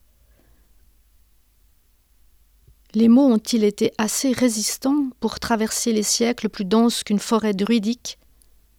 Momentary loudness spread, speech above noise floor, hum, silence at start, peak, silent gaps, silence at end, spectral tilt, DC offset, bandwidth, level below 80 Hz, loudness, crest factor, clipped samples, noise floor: 10 LU; 39 dB; none; 2.95 s; -6 dBFS; none; 0.65 s; -4 dB/octave; under 0.1%; 17 kHz; -54 dBFS; -20 LUFS; 16 dB; under 0.1%; -58 dBFS